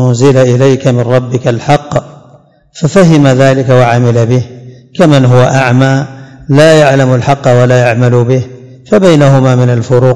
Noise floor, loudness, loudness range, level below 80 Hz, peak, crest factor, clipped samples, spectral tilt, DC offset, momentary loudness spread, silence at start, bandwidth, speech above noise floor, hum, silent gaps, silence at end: -41 dBFS; -7 LUFS; 2 LU; -42 dBFS; 0 dBFS; 8 dB; 8%; -7 dB/octave; 1%; 8 LU; 0 s; 12 kHz; 35 dB; none; none; 0 s